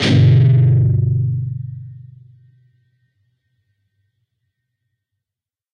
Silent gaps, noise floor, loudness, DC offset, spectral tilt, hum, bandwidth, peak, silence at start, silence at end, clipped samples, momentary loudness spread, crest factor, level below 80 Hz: none; -88 dBFS; -14 LUFS; under 0.1%; -7.5 dB/octave; none; 8.6 kHz; -2 dBFS; 0 s; 3.75 s; under 0.1%; 21 LU; 16 dB; -44 dBFS